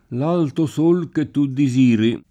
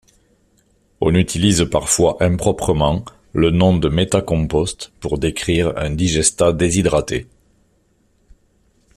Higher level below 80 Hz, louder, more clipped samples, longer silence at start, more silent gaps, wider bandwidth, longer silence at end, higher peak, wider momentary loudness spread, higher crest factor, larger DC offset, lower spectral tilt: second, -60 dBFS vs -36 dBFS; about the same, -18 LUFS vs -17 LUFS; neither; second, 0.1 s vs 1 s; neither; second, 10.5 kHz vs 14 kHz; second, 0.1 s vs 1.75 s; second, -6 dBFS vs 0 dBFS; second, 6 LU vs 9 LU; second, 12 dB vs 18 dB; neither; first, -7.5 dB/octave vs -5 dB/octave